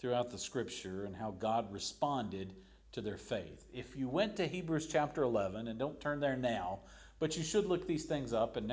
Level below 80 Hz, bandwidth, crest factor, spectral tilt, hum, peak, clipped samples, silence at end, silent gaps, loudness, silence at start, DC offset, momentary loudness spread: -60 dBFS; 8 kHz; 18 dB; -5 dB/octave; none; -20 dBFS; under 0.1%; 0 s; none; -38 LUFS; 0 s; under 0.1%; 9 LU